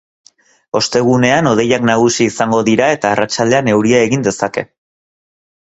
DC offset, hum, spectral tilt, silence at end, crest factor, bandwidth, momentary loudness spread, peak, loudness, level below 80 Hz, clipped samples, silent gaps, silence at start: under 0.1%; none; -4.5 dB/octave; 1 s; 14 dB; 8.2 kHz; 7 LU; 0 dBFS; -13 LUFS; -50 dBFS; under 0.1%; none; 0.75 s